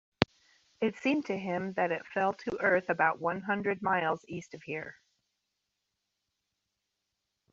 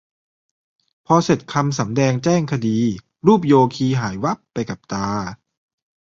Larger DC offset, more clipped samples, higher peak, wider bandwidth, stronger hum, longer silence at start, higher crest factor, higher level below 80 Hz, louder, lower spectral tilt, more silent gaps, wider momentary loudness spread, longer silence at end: neither; neither; about the same, -4 dBFS vs -2 dBFS; about the same, 7.6 kHz vs 7.8 kHz; neither; second, 0.2 s vs 1.1 s; first, 30 dB vs 18 dB; second, -68 dBFS vs -52 dBFS; second, -31 LUFS vs -19 LUFS; second, -3.5 dB/octave vs -6.5 dB/octave; neither; about the same, 11 LU vs 11 LU; first, 2.6 s vs 0.75 s